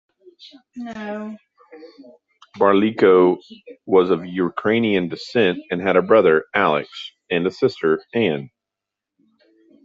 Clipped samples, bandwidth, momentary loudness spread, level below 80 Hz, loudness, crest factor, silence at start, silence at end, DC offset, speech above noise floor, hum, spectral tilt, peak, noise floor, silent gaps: under 0.1%; 7.4 kHz; 17 LU; -64 dBFS; -19 LUFS; 18 dB; 0.45 s; 1.35 s; under 0.1%; 66 dB; none; -7 dB/octave; -2 dBFS; -85 dBFS; none